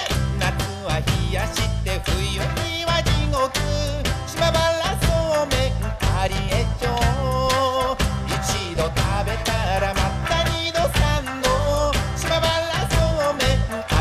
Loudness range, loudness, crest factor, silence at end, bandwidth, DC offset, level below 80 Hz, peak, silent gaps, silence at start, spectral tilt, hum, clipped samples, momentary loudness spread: 2 LU; -22 LUFS; 16 dB; 0 s; 15.5 kHz; under 0.1%; -28 dBFS; -6 dBFS; none; 0 s; -4.5 dB/octave; none; under 0.1%; 4 LU